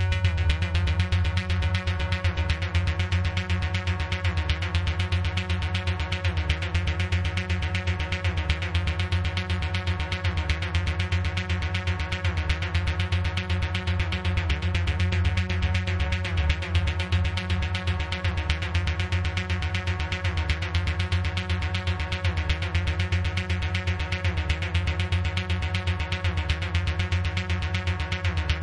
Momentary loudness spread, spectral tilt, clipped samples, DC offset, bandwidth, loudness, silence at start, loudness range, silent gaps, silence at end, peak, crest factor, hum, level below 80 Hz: 2 LU; -5.5 dB/octave; under 0.1%; under 0.1%; 11 kHz; -27 LUFS; 0 s; 1 LU; none; 0 s; -8 dBFS; 18 dB; none; -34 dBFS